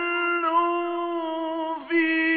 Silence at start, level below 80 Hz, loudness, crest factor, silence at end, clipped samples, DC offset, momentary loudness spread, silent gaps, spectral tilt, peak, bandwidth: 0 s; -70 dBFS; -25 LUFS; 12 dB; 0 s; under 0.1%; under 0.1%; 7 LU; none; 1 dB/octave; -12 dBFS; 4.6 kHz